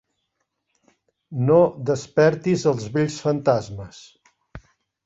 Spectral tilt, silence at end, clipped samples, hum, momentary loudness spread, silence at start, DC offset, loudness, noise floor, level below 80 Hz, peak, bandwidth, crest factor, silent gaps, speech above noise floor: -6.5 dB/octave; 0.45 s; under 0.1%; none; 17 LU; 1.3 s; under 0.1%; -21 LUFS; -76 dBFS; -56 dBFS; -4 dBFS; 8 kHz; 18 dB; none; 55 dB